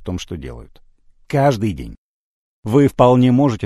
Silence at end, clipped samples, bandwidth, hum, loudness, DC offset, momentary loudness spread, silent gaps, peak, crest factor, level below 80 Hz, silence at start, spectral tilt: 0 s; under 0.1%; 13 kHz; none; -16 LUFS; under 0.1%; 20 LU; 1.98-2.63 s; 0 dBFS; 18 dB; -40 dBFS; 0 s; -7.5 dB/octave